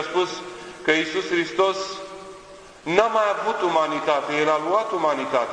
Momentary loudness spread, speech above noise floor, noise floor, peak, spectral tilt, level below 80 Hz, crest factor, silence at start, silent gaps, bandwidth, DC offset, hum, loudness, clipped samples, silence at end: 15 LU; 22 dB; -44 dBFS; -2 dBFS; -3.5 dB/octave; -62 dBFS; 20 dB; 0 s; none; 10.5 kHz; under 0.1%; none; -22 LUFS; under 0.1%; 0 s